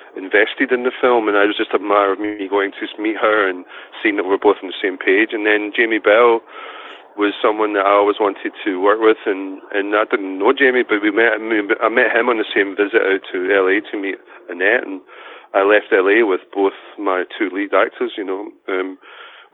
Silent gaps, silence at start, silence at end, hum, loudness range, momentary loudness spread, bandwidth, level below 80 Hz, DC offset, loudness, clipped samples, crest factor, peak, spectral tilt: none; 0.15 s; 0.25 s; none; 2 LU; 11 LU; 4.2 kHz; -70 dBFS; under 0.1%; -17 LUFS; under 0.1%; 16 dB; -2 dBFS; -7 dB/octave